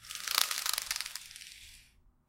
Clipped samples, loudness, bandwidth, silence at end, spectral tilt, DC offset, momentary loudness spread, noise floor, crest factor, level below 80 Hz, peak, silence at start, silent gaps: under 0.1%; -32 LUFS; 17 kHz; 0.45 s; 3 dB/octave; under 0.1%; 20 LU; -63 dBFS; 34 dB; -66 dBFS; -4 dBFS; 0 s; none